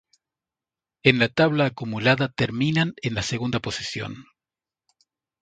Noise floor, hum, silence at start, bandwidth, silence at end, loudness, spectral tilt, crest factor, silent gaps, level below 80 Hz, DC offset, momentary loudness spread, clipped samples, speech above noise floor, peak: under -90 dBFS; none; 1.05 s; 9.4 kHz; 1.2 s; -23 LUFS; -5.5 dB/octave; 24 dB; none; -52 dBFS; under 0.1%; 11 LU; under 0.1%; over 67 dB; 0 dBFS